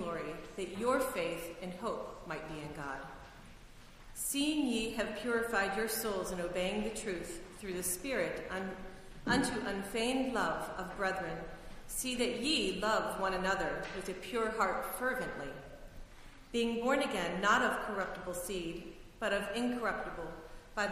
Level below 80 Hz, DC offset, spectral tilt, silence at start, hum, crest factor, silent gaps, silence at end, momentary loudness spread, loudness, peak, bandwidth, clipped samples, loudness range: -54 dBFS; under 0.1%; -3.5 dB/octave; 0 s; none; 22 dB; none; 0 s; 13 LU; -36 LUFS; -16 dBFS; 15.5 kHz; under 0.1%; 4 LU